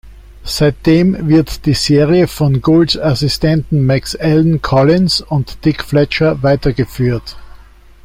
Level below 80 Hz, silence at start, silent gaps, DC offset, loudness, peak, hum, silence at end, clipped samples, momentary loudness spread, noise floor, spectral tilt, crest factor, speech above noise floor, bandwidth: -32 dBFS; 0.05 s; none; under 0.1%; -13 LUFS; 0 dBFS; none; 0.5 s; under 0.1%; 6 LU; -39 dBFS; -6.5 dB/octave; 12 dB; 27 dB; 16 kHz